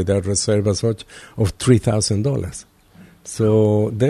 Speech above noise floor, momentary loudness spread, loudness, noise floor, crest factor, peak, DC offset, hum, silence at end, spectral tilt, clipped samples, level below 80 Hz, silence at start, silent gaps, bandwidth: 29 dB; 16 LU; -18 LUFS; -47 dBFS; 16 dB; -2 dBFS; under 0.1%; none; 0 s; -6 dB/octave; under 0.1%; -44 dBFS; 0 s; none; 12.5 kHz